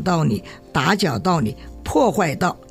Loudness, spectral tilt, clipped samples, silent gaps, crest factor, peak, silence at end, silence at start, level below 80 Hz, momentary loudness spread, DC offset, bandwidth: -20 LUFS; -5.5 dB/octave; under 0.1%; none; 16 dB; -4 dBFS; 0.05 s; 0 s; -44 dBFS; 8 LU; under 0.1%; 16 kHz